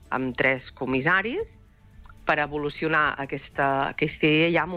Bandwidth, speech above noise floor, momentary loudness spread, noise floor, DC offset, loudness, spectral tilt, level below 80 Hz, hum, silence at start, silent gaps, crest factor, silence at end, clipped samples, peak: 8.4 kHz; 25 dB; 11 LU; -50 dBFS; under 0.1%; -24 LUFS; -7.5 dB/octave; -50 dBFS; none; 0.1 s; none; 16 dB; 0 s; under 0.1%; -10 dBFS